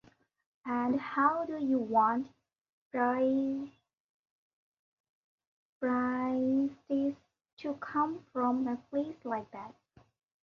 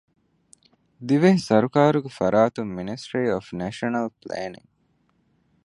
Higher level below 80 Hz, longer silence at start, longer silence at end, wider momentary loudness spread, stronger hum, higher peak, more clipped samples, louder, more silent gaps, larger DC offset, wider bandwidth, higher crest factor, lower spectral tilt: second, -74 dBFS vs -60 dBFS; second, 0.65 s vs 1 s; second, 0.7 s vs 1.1 s; about the same, 14 LU vs 14 LU; neither; second, -14 dBFS vs -2 dBFS; neither; second, -32 LUFS vs -23 LUFS; first, 2.69-2.91 s, 4.00-4.72 s, 4.79-5.38 s, 5.47-5.81 s, 7.53-7.57 s vs none; neither; second, 6.4 kHz vs 11 kHz; about the same, 20 dB vs 22 dB; about the same, -7.5 dB/octave vs -7 dB/octave